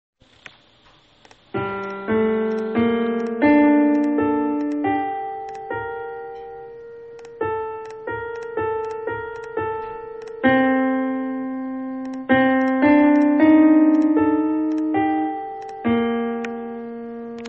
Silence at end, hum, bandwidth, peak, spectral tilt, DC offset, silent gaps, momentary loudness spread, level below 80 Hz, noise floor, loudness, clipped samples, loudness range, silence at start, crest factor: 0 s; none; 6 kHz; -4 dBFS; -7.5 dB/octave; under 0.1%; none; 18 LU; -56 dBFS; -54 dBFS; -20 LUFS; under 0.1%; 12 LU; 1.55 s; 16 dB